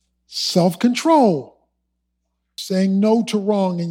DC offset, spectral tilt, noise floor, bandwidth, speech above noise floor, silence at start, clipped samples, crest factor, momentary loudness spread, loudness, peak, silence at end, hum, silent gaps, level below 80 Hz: under 0.1%; -6 dB/octave; -73 dBFS; 16.5 kHz; 56 dB; 0.3 s; under 0.1%; 16 dB; 13 LU; -18 LUFS; -4 dBFS; 0 s; none; none; -70 dBFS